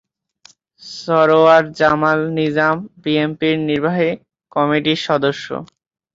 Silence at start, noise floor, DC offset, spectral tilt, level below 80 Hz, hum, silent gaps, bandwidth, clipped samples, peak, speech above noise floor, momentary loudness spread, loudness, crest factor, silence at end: 0.85 s; -51 dBFS; under 0.1%; -6 dB/octave; -58 dBFS; none; none; 7.8 kHz; under 0.1%; -2 dBFS; 35 dB; 15 LU; -16 LUFS; 16 dB; 0.5 s